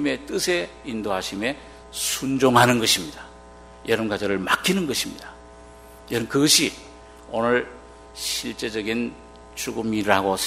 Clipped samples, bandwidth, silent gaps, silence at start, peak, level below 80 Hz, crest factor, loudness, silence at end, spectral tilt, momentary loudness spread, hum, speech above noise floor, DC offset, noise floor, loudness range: under 0.1%; 16 kHz; none; 0 s; 0 dBFS; -50 dBFS; 24 dB; -22 LUFS; 0 s; -3 dB/octave; 20 LU; none; 22 dB; under 0.1%; -45 dBFS; 5 LU